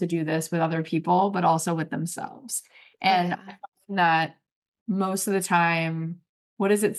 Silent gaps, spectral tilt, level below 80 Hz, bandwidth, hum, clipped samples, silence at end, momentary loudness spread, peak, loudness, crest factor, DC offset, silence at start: 3.68-3.72 s, 4.52-4.72 s, 4.81-4.86 s, 6.29-6.57 s; -4.5 dB/octave; -78 dBFS; 12.5 kHz; none; under 0.1%; 0 s; 11 LU; -6 dBFS; -25 LUFS; 18 dB; under 0.1%; 0 s